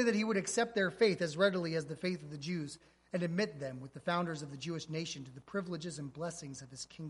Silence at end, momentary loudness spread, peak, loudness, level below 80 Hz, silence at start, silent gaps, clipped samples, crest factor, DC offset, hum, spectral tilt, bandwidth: 0 s; 14 LU; -18 dBFS; -36 LUFS; -72 dBFS; 0 s; none; under 0.1%; 18 dB; under 0.1%; none; -5 dB/octave; 11.5 kHz